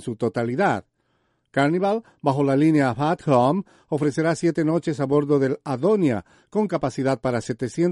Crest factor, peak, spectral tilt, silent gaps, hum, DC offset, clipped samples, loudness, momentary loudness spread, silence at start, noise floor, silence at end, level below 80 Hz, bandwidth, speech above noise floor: 16 dB; -4 dBFS; -7 dB/octave; none; none; under 0.1%; under 0.1%; -22 LUFS; 7 LU; 0 s; -69 dBFS; 0 s; -58 dBFS; 11.5 kHz; 47 dB